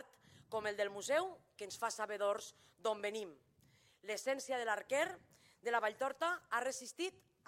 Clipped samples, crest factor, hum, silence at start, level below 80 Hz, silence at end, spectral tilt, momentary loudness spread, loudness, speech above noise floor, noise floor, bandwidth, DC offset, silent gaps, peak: under 0.1%; 20 dB; none; 0 s; -86 dBFS; 0.4 s; -2 dB/octave; 11 LU; -40 LUFS; 30 dB; -71 dBFS; 16.5 kHz; under 0.1%; none; -22 dBFS